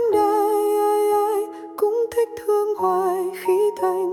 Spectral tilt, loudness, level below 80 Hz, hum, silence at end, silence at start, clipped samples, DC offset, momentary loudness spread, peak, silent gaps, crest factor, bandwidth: -4.5 dB/octave; -21 LUFS; -66 dBFS; none; 0 s; 0 s; under 0.1%; under 0.1%; 5 LU; -8 dBFS; none; 12 dB; 17.5 kHz